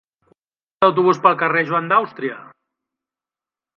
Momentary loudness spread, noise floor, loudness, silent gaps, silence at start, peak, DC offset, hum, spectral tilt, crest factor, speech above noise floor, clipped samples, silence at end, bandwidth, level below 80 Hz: 13 LU; under -90 dBFS; -17 LUFS; none; 0.8 s; 0 dBFS; under 0.1%; none; -6.5 dB/octave; 20 dB; over 73 dB; under 0.1%; 1.35 s; 7 kHz; -70 dBFS